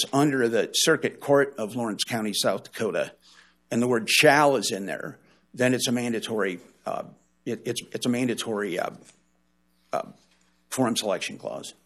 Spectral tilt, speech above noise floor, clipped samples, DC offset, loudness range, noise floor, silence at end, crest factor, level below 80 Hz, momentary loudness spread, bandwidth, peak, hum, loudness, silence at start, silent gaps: -3.5 dB/octave; 43 dB; under 0.1%; under 0.1%; 8 LU; -69 dBFS; 0.15 s; 22 dB; -72 dBFS; 14 LU; 15 kHz; -4 dBFS; none; -25 LUFS; 0 s; none